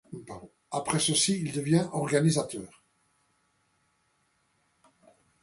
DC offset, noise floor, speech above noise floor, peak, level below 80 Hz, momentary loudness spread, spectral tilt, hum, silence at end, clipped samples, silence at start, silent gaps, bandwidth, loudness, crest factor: under 0.1%; -72 dBFS; 45 dB; -10 dBFS; -66 dBFS; 20 LU; -4.5 dB/octave; none; 2.75 s; under 0.1%; 0.1 s; none; 11.5 kHz; -27 LUFS; 20 dB